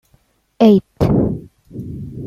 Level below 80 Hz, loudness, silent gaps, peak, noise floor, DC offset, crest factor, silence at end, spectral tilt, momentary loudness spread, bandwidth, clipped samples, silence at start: -36 dBFS; -15 LUFS; none; -2 dBFS; -58 dBFS; under 0.1%; 16 dB; 0 s; -9 dB/octave; 19 LU; 13.5 kHz; under 0.1%; 0.6 s